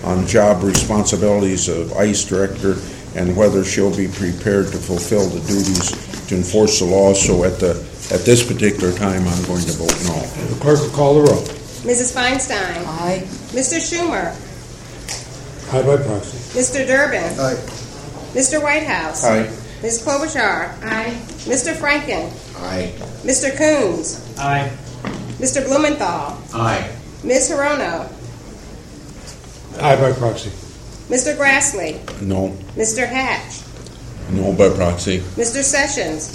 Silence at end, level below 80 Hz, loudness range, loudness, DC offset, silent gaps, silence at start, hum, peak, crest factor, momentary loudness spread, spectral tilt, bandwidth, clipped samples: 0 s; -38 dBFS; 5 LU; -17 LUFS; under 0.1%; none; 0 s; none; 0 dBFS; 18 dB; 16 LU; -4 dB/octave; 16 kHz; under 0.1%